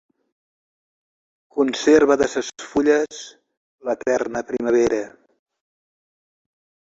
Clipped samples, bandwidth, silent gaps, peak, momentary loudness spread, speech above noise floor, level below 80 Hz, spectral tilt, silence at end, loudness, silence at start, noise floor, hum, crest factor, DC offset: under 0.1%; 8 kHz; 3.57-3.78 s; -4 dBFS; 16 LU; over 71 dB; -56 dBFS; -4 dB/octave; 1.85 s; -20 LUFS; 1.55 s; under -90 dBFS; none; 20 dB; under 0.1%